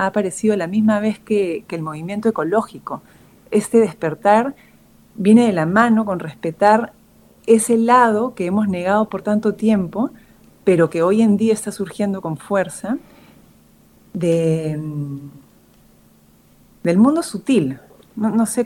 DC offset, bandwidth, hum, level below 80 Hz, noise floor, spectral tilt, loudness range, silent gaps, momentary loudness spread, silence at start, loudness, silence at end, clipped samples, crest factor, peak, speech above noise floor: under 0.1%; 15 kHz; none; -58 dBFS; -52 dBFS; -6 dB/octave; 7 LU; none; 13 LU; 0 s; -18 LUFS; 0 s; under 0.1%; 18 dB; 0 dBFS; 35 dB